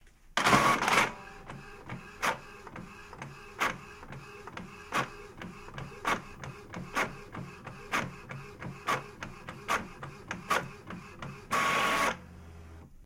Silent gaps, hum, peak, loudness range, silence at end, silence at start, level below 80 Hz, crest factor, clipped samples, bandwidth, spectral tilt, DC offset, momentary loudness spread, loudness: none; none; -8 dBFS; 8 LU; 0 s; 0.05 s; -56 dBFS; 26 dB; under 0.1%; 16.5 kHz; -3 dB/octave; under 0.1%; 20 LU; -31 LUFS